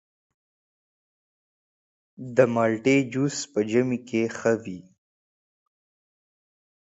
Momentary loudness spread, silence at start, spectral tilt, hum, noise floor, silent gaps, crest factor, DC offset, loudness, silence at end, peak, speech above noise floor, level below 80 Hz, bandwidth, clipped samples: 10 LU; 2.2 s; -5.5 dB/octave; none; under -90 dBFS; none; 24 dB; under 0.1%; -24 LUFS; 2.05 s; -4 dBFS; over 66 dB; -68 dBFS; 8 kHz; under 0.1%